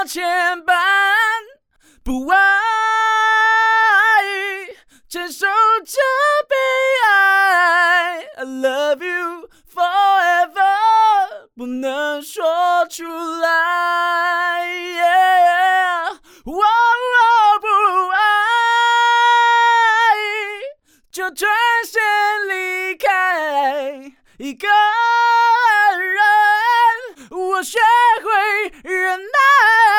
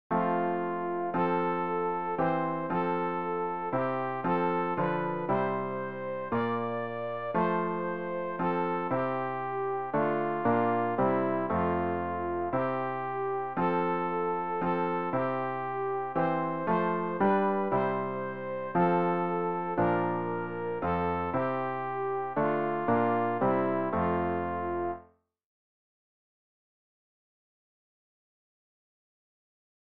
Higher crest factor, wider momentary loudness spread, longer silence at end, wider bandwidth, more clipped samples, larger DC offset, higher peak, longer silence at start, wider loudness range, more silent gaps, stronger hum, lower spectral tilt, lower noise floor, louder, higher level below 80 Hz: about the same, 12 dB vs 16 dB; first, 13 LU vs 6 LU; second, 0 s vs 4.45 s; first, 19 kHz vs 5 kHz; neither; second, under 0.1% vs 0.3%; first, -4 dBFS vs -14 dBFS; about the same, 0 s vs 0.1 s; about the same, 4 LU vs 2 LU; neither; neither; second, -0.5 dB/octave vs -6.5 dB/octave; second, -54 dBFS vs -58 dBFS; first, -15 LUFS vs -30 LUFS; first, -52 dBFS vs -62 dBFS